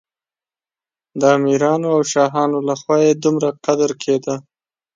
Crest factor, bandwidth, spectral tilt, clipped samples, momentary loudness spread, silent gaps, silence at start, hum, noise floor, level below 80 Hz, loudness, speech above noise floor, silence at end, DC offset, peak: 16 dB; 9.2 kHz; -5.5 dB/octave; under 0.1%; 6 LU; none; 1.15 s; none; under -90 dBFS; -66 dBFS; -17 LUFS; over 74 dB; 0.55 s; under 0.1%; -2 dBFS